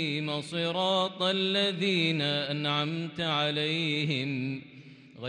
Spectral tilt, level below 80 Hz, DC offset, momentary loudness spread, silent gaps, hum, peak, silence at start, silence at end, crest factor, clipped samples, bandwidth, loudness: -5.5 dB/octave; -74 dBFS; under 0.1%; 6 LU; none; none; -14 dBFS; 0 s; 0 s; 16 dB; under 0.1%; 10.5 kHz; -28 LUFS